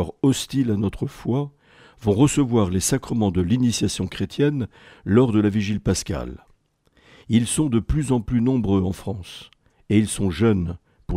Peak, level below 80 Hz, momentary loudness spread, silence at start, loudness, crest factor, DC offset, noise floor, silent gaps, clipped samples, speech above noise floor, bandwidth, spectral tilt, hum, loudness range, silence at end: -4 dBFS; -42 dBFS; 12 LU; 0 s; -22 LUFS; 16 dB; under 0.1%; -61 dBFS; none; under 0.1%; 40 dB; 15.5 kHz; -6 dB/octave; none; 2 LU; 0 s